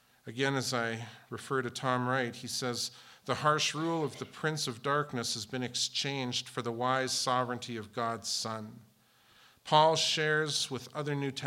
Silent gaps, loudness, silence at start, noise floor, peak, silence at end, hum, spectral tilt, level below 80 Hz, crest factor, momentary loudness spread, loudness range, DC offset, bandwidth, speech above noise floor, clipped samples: none; -32 LUFS; 0.25 s; -65 dBFS; -10 dBFS; 0 s; none; -3.5 dB/octave; -80 dBFS; 24 dB; 11 LU; 3 LU; under 0.1%; 17 kHz; 32 dB; under 0.1%